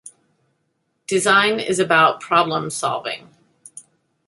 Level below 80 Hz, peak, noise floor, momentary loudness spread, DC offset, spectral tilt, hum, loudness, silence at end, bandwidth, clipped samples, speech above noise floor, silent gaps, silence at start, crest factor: -66 dBFS; -2 dBFS; -70 dBFS; 13 LU; under 0.1%; -3 dB/octave; none; -18 LUFS; 0.45 s; 12 kHz; under 0.1%; 52 dB; none; 0.05 s; 20 dB